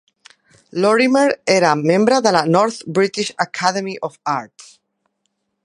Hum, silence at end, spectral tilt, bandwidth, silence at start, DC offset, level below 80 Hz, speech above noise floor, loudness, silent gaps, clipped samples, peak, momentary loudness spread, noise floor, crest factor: none; 1.2 s; -4.5 dB/octave; 11.5 kHz; 0.75 s; under 0.1%; -68 dBFS; 55 dB; -17 LUFS; none; under 0.1%; 0 dBFS; 10 LU; -72 dBFS; 18 dB